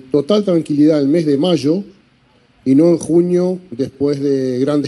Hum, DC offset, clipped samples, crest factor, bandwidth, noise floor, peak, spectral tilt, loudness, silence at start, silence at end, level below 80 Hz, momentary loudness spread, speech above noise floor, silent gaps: none; under 0.1%; under 0.1%; 12 dB; 11.5 kHz; -53 dBFS; -2 dBFS; -7.5 dB/octave; -15 LUFS; 0.15 s; 0 s; -58 dBFS; 8 LU; 39 dB; none